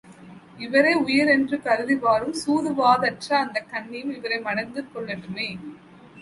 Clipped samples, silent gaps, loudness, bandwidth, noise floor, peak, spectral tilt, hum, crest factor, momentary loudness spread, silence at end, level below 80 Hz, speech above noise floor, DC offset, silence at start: under 0.1%; none; -23 LUFS; 11.5 kHz; -45 dBFS; -6 dBFS; -4.5 dB/octave; none; 18 dB; 14 LU; 0 s; -64 dBFS; 22 dB; under 0.1%; 0.05 s